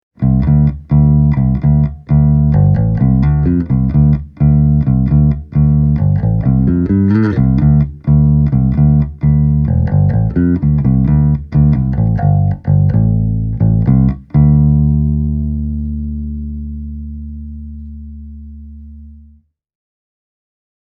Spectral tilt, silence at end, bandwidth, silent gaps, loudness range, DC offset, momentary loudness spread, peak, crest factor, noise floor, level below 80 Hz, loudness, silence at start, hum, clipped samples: -13 dB/octave; 1.7 s; 2.5 kHz; none; 13 LU; under 0.1%; 14 LU; 0 dBFS; 12 dB; -47 dBFS; -20 dBFS; -12 LUFS; 0.2 s; none; under 0.1%